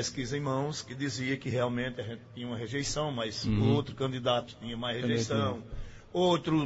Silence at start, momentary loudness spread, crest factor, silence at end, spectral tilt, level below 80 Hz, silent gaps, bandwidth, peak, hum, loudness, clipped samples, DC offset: 0 s; 13 LU; 16 dB; 0 s; -5 dB/octave; -50 dBFS; none; 8 kHz; -14 dBFS; none; -32 LUFS; under 0.1%; under 0.1%